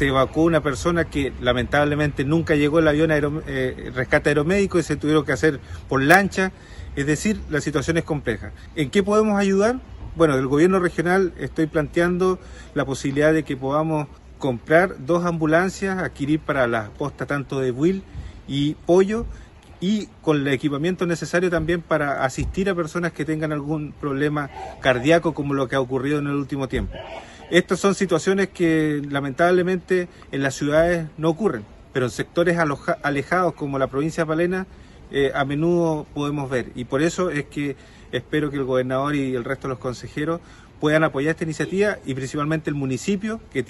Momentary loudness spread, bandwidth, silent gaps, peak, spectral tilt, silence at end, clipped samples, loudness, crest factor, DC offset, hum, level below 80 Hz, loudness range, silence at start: 10 LU; 12.5 kHz; none; 0 dBFS; -6 dB/octave; 0.05 s; under 0.1%; -22 LUFS; 22 dB; under 0.1%; none; -42 dBFS; 4 LU; 0 s